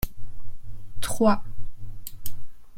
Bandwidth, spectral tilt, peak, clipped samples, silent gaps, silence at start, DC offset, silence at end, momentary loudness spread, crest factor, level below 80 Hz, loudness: 16.5 kHz; -5 dB/octave; -6 dBFS; under 0.1%; none; 0 s; under 0.1%; 0 s; 25 LU; 16 dB; -38 dBFS; -27 LUFS